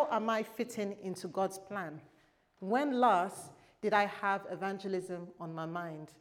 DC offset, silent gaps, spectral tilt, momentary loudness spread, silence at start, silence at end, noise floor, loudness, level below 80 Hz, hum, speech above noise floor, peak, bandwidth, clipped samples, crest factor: under 0.1%; none; -5 dB/octave; 16 LU; 0 s; 0.1 s; -67 dBFS; -35 LUFS; -80 dBFS; none; 33 dB; -14 dBFS; 18 kHz; under 0.1%; 20 dB